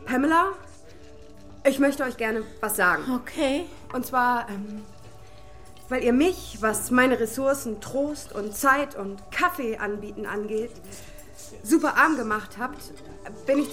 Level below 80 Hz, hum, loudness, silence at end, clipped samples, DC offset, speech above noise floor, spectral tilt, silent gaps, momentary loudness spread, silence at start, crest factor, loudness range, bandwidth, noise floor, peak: -52 dBFS; none; -25 LUFS; 0 s; under 0.1%; 0.5%; 23 dB; -4 dB/octave; none; 18 LU; 0 s; 20 dB; 3 LU; 16.5 kHz; -48 dBFS; -6 dBFS